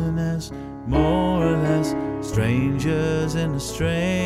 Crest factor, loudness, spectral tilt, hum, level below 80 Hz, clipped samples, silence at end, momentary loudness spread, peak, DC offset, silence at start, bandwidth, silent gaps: 16 dB; -22 LUFS; -6.5 dB/octave; none; -36 dBFS; under 0.1%; 0 s; 6 LU; -6 dBFS; under 0.1%; 0 s; 14.5 kHz; none